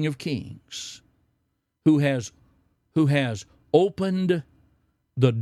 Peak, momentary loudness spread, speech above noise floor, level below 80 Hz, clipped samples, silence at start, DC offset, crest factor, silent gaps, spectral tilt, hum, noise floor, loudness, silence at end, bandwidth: -6 dBFS; 16 LU; 52 dB; -62 dBFS; under 0.1%; 0 s; under 0.1%; 20 dB; none; -6.5 dB/octave; none; -75 dBFS; -24 LUFS; 0 s; 12.5 kHz